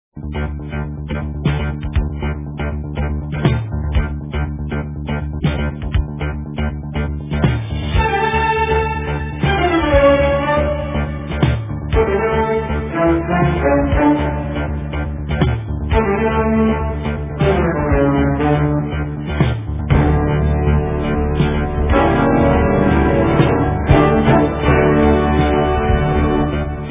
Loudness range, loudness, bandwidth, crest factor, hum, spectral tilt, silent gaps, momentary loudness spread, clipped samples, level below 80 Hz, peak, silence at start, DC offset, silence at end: 7 LU; -17 LUFS; 3.8 kHz; 16 dB; none; -11.5 dB/octave; none; 10 LU; under 0.1%; -22 dBFS; 0 dBFS; 0.15 s; under 0.1%; 0 s